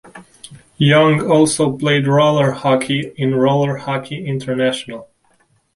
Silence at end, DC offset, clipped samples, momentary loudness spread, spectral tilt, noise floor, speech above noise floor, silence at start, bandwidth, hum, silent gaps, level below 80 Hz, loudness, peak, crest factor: 0.7 s; under 0.1%; under 0.1%; 11 LU; -5.5 dB/octave; -58 dBFS; 43 dB; 0.15 s; 11.5 kHz; none; none; -54 dBFS; -16 LUFS; 0 dBFS; 16 dB